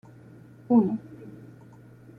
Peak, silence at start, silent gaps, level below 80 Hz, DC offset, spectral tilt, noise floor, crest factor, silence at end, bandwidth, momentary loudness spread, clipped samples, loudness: -10 dBFS; 0.7 s; none; -68 dBFS; under 0.1%; -11 dB/octave; -50 dBFS; 20 dB; 0.85 s; 2.7 kHz; 24 LU; under 0.1%; -24 LUFS